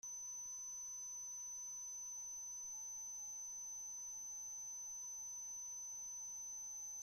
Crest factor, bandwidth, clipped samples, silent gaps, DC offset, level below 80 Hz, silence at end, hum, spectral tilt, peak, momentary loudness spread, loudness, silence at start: 6 dB; 16 kHz; under 0.1%; none; under 0.1%; -84 dBFS; 0 s; none; 1.5 dB/octave; -44 dBFS; 0 LU; -46 LUFS; 0.05 s